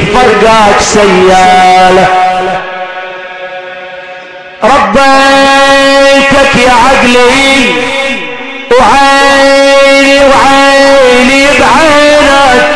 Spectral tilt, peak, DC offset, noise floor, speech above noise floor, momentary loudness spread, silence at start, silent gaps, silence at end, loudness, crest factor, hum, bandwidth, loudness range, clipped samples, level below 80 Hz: -3 dB/octave; 0 dBFS; under 0.1%; -25 dBFS; 22 dB; 16 LU; 0 s; none; 0 s; -3 LUFS; 4 dB; none; 11 kHz; 6 LU; 10%; -28 dBFS